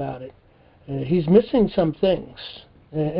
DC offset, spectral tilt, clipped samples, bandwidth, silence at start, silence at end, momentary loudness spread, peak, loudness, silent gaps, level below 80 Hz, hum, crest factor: under 0.1%; -12 dB/octave; under 0.1%; 5.4 kHz; 0 s; 0 s; 20 LU; -4 dBFS; -21 LUFS; none; -48 dBFS; none; 20 dB